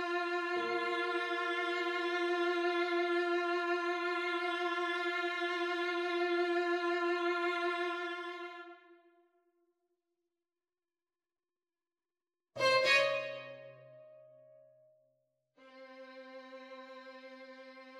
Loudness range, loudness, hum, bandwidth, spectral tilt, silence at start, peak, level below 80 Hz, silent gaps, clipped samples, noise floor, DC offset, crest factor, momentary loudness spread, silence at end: 20 LU; -33 LUFS; none; 11.5 kHz; -3 dB/octave; 0 s; -16 dBFS; -88 dBFS; none; under 0.1%; under -90 dBFS; under 0.1%; 22 dB; 19 LU; 0 s